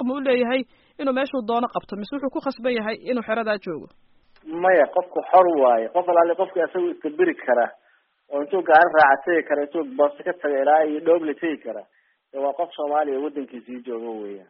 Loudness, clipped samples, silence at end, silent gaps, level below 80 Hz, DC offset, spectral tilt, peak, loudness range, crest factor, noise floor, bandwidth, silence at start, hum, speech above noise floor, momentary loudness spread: -21 LUFS; under 0.1%; 0.1 s; none; -68 dBFS; under 0.1%; -2.5 dB/octave; -2 dBFS; 6 LU; 20 dB; -59 dBFS; 5.6 kHz; 0 s; none; 38 dB; 15 LU